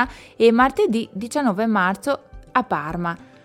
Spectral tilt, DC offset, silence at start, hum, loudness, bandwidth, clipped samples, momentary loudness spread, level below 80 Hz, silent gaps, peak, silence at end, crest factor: -5.5 dB/octave; under 0.1%; 0 s; none; -21 LUFS; 15 kHz; under 0.1%; 10 LU; -48 dBFS; none; -2 dBFS; 0.2 s; 18 dB